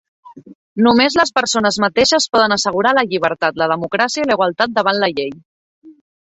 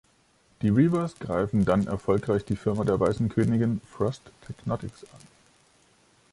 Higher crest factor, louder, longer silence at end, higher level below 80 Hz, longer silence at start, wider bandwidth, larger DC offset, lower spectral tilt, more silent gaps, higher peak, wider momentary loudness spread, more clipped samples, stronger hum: about the same, 16 dB vs 18 dB; first, -15 LUFS vs -26 LUFS; second, 0.4 s vs 1.15 s; about the same, -54 dBFS vs -50 dBFS; second, 0.25 s vs 0.6 s; second, 8.4 kHz vs 11.5 kHz; neither; second, -3 dB/octave vs -8.5 dB/octave; first, 0.55-0.76 s, 5.45-5.82 s vs none; first, -2 dBFS vs -8 dBFS; second, 6 LU vs 11 LU; neither; neither